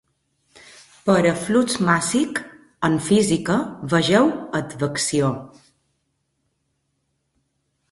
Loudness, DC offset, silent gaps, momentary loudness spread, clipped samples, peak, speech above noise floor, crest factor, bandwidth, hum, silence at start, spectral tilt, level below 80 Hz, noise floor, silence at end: -20 LUFS; under 0.1%; none; 9 LU; under 0.1%; -2 dBFS; 53 dB; 20 dB; 11.5 kHz; none; 1.05 s; -5 dB/octave; -56 dBFS; -72 dBFS; 2.45 s